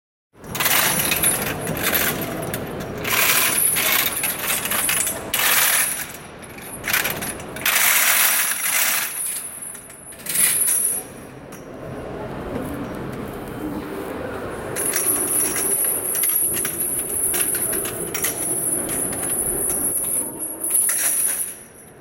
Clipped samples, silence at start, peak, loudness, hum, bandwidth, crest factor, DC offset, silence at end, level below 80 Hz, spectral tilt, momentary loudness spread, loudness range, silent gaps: under 0.1%; 0.4 s; -2 dBFS; -19 LUFS; none; 17 kHz; 20 dB; under 0.1%; 0 s; -48 dBFS; -1 dB/octave; 16 LU; 6 LU; none